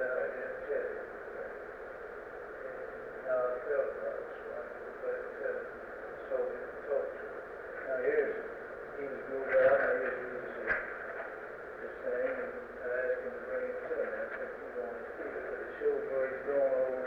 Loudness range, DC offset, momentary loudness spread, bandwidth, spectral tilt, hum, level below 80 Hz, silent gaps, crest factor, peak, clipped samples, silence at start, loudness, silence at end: 6 LU; under 0.1%; 12 LU; 5.4 kHz; -6.5 dB/octave; none; -66 dBFS; none; 18 dB; -18 dBFS; under 0.1%; 0 s; -36 LUFS; 0 s